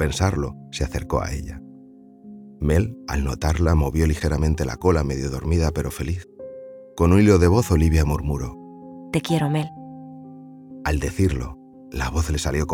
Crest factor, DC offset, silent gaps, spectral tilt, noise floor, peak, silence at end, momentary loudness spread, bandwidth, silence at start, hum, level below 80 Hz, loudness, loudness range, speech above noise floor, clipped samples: 18 dB; under 0.1%; none; -6.5 dB/octave; -46 dBFS; -4 dBFS; 0 s; 22 LU; 16.5 kHz; 0 s; none; -30 dBFS; -22 LUFS; 6 LU; 26 dB; under 0.1%